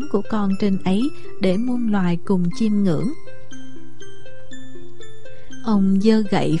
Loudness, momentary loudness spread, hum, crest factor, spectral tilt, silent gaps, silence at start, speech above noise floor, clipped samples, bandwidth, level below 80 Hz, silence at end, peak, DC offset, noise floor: -20 LUFS; 24 LU; none; 16 dB; -7.5 dB/octave; none; 0 s; 23 dB; under 0.1%; 11 kHz; -50 dBFS; 0 s; -4 dBFS; 8%; -42 dBFS